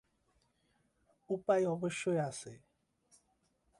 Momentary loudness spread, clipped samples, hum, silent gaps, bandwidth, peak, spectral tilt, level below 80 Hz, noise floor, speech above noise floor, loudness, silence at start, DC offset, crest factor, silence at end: 13 LU; under 0.1%; none; none; 11.5 kHz; -18 dBFS; -5.5 dB/octave; -78 dBFS; -77 dBFS; 42 dB; -35 LUFS; 1.3 s; under 0.1%; 20 dB; 1.25 s